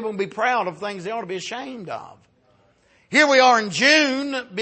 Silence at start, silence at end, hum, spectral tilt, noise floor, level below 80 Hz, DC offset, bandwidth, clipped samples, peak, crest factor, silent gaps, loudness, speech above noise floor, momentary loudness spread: 0 s; 0 s; none; -2.5 dB/octave; -60 dBFS; -70 dBFS; under 0.1%; 8.8 kHz; under 0.1%; -4 dBFS; 18 dB; none; -19 LUFS; 39 dB; 17 LU